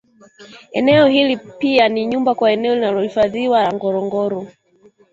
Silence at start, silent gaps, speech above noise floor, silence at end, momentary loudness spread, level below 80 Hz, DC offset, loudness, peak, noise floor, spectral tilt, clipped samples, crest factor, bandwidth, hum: 0.4 s; none; 36 dB; 0.65 s; 9 LU; -56 dBFS; under 0.1%; -16 LUFS; -2 dBFS; -52 dBFS; -6.5 dB/octave; under 0.1%; 16 dB; 7.8 kHz; none